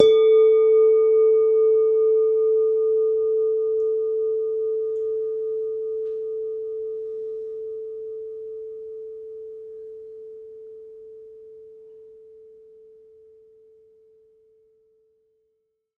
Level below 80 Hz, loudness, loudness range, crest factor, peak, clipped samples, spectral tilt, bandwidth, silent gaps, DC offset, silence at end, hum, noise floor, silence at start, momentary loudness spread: -70 dBFS; -21 LUFS; 23 LU; 22 dB; 0 dBFS; under 0.1%; -5 dB/octave; 3.7 kHz; none; under 0.1%; 3.95 s; none; -73 dBFS; 0 s; 24 LU